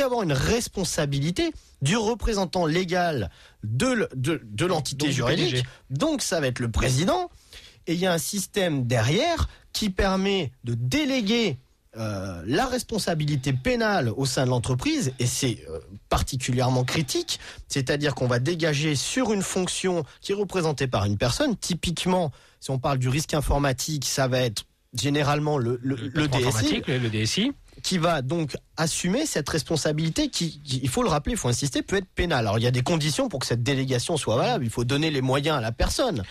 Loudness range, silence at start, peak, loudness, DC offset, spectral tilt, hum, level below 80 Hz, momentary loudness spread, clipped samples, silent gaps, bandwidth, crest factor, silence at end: 1 LU; 0 s; -12 dBFS; -25 LUFS; under 0.1%; -4.5 dB/octave; none; -40 dBFS; 6 LU; under 0.1%; none; 15 kHz; 14 dB; 0 s